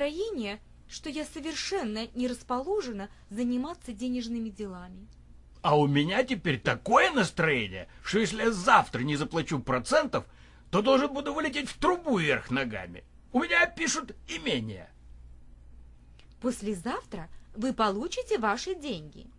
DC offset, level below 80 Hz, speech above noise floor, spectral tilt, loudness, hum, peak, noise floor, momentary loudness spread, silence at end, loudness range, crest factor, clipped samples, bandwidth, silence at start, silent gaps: under 0.1%; -52 dBFS; 24 dB; -4.5 dB/octave; -29 LUFS; none; -6 dBFS; -53 dBFS; 15 LU; 0.1 s; 8 LU; 24 dB; under 0.1%; 11.5 kHz; 0 s; none